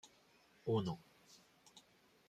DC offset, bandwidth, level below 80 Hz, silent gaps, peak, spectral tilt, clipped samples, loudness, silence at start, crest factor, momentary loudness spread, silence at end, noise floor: under 0.1%; 14.5 kHz; -78 dBFS; none; -26 dBFS; -7 dB/octave; under 0.1%; -42 LUFS; 0.05 s; 20 dB; 25 LU; 0.5 s; -70 dBFS